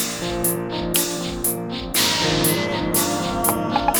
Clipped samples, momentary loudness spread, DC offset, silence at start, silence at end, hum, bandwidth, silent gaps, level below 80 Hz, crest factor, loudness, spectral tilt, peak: under 0.1%; 5 LU; under 0.1%; 0 s; 0 s; none; over 20 kHz; none; -40 dBFS; 20 dB; -20 LUFS; -3 dB/octave; -2 dBFS